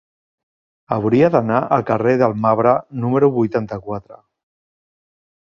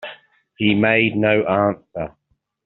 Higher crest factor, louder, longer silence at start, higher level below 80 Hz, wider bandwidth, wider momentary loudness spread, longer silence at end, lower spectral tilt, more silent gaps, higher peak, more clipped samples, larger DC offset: about the same, 18 dB vs 18 dB; about the same, -17 LUFS vs -18 LUFS; first, 0.9 s vs 0 s; about the same, -54 dBFS vs -56 dBFS; first, 7 kHz vs 4.2 kHz; second, 11 LU vs 15 LU; first, 1.35 s vs 0.55 s; first, -9.5 dB/octave vs -4 dB/octave; neither; about the same, -2 dBFS vs -2 dBFS; neither; neither